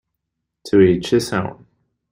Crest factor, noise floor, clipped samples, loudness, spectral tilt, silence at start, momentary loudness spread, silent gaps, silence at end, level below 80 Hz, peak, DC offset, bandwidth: 16 dB; -78 dBFS; under 0.1%; -17 LUFS; -6 dB/octave; 0.65 s; 10 LU; none; 0.6 s; -48 dBFS; -2 dBFS; under 0.1%; 16 kHz